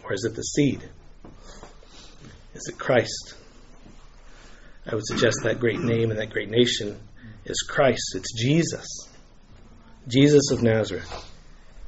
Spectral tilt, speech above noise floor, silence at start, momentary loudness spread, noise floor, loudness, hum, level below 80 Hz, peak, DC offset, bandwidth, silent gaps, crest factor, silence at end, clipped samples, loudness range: -5 dB/octave; 25 dB; 0.05 s; 18 LU; -48 dBFS; -23 LUFS; none; -48 dBFS; -4 dBFS; under 0.1%; 8 kHz; none; 22 dB; 0 s; under 0.1%; 8 LU